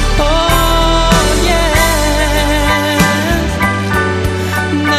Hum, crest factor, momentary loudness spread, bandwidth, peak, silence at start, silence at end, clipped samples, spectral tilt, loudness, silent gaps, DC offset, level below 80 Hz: none; 12 dB; 4 LU; 14.5 kHz; 0 dBFS; 0 s; 0 s; under 0.1%; -4 dB/octave; -12 LUFS; none; under 0.1%; -18 dBFS